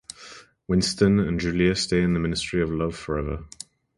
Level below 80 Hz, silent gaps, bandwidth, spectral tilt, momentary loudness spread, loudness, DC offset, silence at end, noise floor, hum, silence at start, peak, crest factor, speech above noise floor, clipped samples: -40 dBFS; none; 11.5 kHz; -5.5 dB/octave; 21 LU; -24 LUFS; under 0.1%; 0.5 s; -47 dBFS; none; 0.2 s; -6 dBFS; 18 dB; 24 dB; under 0.1%